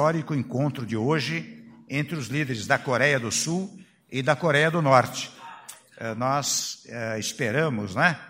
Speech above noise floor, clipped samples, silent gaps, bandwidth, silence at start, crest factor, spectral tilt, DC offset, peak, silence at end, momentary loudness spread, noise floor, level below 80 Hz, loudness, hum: 21 dB; under 0.1%; none; 16 kHz; 0 s; 24 dB; -4 dB/octave; under 0.1%; -2 dBFS; 0 s; 14 LU; -45 dBFS; -66 dBFS; -25 LUFS; none